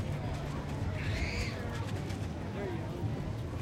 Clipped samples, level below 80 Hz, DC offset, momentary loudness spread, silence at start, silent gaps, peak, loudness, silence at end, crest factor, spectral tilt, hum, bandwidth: under 0.1%; -44 dBFS; under 0.1%; 4 LU; 0 s; none; -22 dBFS; -37 LUFS; 0 s; 14 dB; -6.5 dB/octave; none; 15.5 kHz